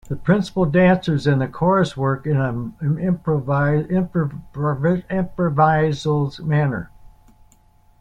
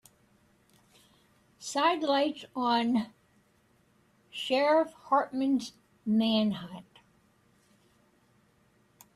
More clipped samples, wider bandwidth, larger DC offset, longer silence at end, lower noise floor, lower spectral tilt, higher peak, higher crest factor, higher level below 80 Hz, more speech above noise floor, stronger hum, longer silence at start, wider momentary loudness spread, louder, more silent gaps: neither; second, 9.4 kHz vs 14 kHz; neither; second, 1.15 s vs 2.35 s; second, -54 dBFS vs -67 dBFS; first, -8 dB/octave vs -4.5 dB/octave; first, -4 dBFS vs -14 dBFS; about the same, 16 dB vs 18 dB; first, -46 dBFS vs -74 dBFS; second, 35 dB vs 39 dB; neither; second, 0.05 s vs 1.6 s; second, 8 LU vs 18 LU; first, -20 LUFS vs -29 LUFS; neither